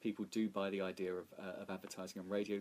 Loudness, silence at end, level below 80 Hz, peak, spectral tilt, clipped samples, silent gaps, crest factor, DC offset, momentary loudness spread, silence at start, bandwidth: -43 LUFS; 0 s; -84 dBFS; -28 dBFS; -5.5 dB/octave; under 0.1%; none; 14 dB; under 0.1%; 9 LU; 0 s; 15.5 kHz